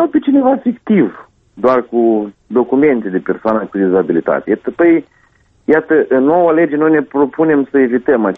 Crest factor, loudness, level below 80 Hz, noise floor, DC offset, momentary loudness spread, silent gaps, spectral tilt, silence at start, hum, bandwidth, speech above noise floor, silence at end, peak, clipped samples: 12 dB; -13 LUFS; -54 dBFS; -53 dBFS; under 0.1%; 5 LU; none; -10 dB/octave; 0 s; none; 4.4 kHz; 40 dB; 0 s; 0 dBFS; under 0.1%